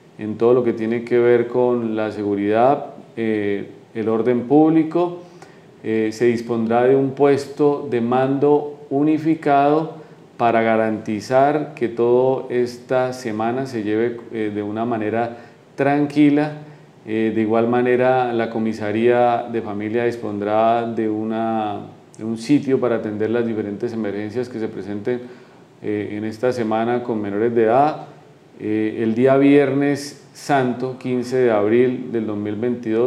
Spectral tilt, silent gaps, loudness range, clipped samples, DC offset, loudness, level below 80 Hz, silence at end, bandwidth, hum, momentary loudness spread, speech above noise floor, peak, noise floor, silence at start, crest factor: -7.5 dB/octave; none; 4 LU; under 0.1%; under 0.1%; -19 LUFS; -72 dBFS; 0 s; 12 kHz; none; 10 LU; 25 dB; -4 dBFS; -43 dBFS; 0.2 s; 16 dB